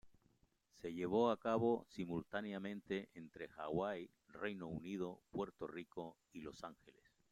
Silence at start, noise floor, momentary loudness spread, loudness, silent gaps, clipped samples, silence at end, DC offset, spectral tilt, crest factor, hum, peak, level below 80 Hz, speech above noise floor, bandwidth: 0.05 s; -77 dBFS; 17 LU; -44 LUFS; none; under 0.1%; 0.4 s; under 0.1%; -7 dB/octave; 20 dB; none; -24 dBFS; -74 dBFS; 34 dB; 13.5 kHz